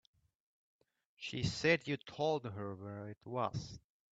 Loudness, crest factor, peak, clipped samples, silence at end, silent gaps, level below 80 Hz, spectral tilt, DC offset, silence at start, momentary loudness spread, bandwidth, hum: -38 LUFS; 22 dB; -18 dBFS; under 0.1%; 0.35 s; none; -66 dBFS; -5 dB/octave; under 0.1%; 1.2 s; 15 LU; 9 kHz; none